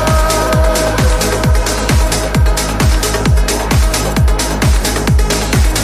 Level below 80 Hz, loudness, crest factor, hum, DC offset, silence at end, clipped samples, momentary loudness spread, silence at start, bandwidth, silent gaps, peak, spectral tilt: -14 dBFS; -13 LUFS; 10 dB; none; under 0.1%; 0 s; under 0.1%; 2 LU; 0 s; 15.5 kHz; none; 0 dBFS; -4.5 dB/octave